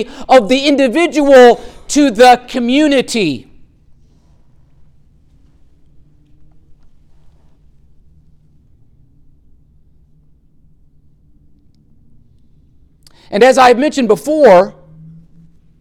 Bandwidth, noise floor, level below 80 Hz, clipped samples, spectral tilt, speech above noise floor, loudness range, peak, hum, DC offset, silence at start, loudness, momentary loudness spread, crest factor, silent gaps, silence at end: 15 kHz; -47 dBFS; -44 dBFS; under 0.1%; -4 dB/octave; 38 dB; 11 LU; 0 dBFS; none; under 0.1%; 0 s; -10 LUFS; 11 LU; 14 dB; none; 1.1 s